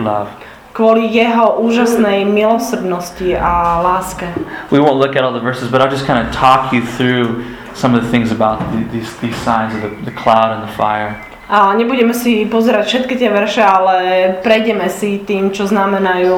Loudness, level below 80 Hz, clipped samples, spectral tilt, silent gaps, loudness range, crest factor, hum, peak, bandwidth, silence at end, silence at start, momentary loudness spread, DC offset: -13 LUFS; -38 dBFS; under 0.1%; -5.5 dB/octave; none; 3 LU; 14 dB; none; 0 dBFS; 17.5 kHz; 0 s; 0 s; 10 LU; under 0.1%